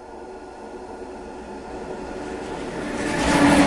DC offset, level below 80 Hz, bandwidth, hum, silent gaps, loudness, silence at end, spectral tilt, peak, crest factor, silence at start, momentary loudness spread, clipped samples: under 0.1%; -42 dBFS; 11.5 kHz; none; none; -26 LUFS; 0 s; -4.5 dB/octave; -4 dBFS; 20 dB; 0 s; 19 LU; under 0.1%